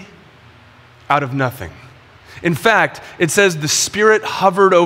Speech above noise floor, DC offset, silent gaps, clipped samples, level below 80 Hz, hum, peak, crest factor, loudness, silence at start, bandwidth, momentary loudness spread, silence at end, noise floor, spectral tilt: 30 dB; under 0.1%; none; under 0.1%; -52 dBFS; none; 0 dBFS; 16 dB; -15 LUFS; 0 s; 16.5 kHz; 9 LU; 0 s; -45 dBFS; -3.5 dB/octave